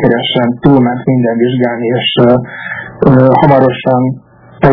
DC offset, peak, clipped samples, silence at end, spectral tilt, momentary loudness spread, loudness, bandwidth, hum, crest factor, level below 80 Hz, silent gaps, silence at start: under 0.1%; 0 dBFS; 2%; 0 s; -10 dB/octave; 10 LU; -10 LUFS; 5.4 kHz; none; 10 dB; -38 dBFS; none; 0 s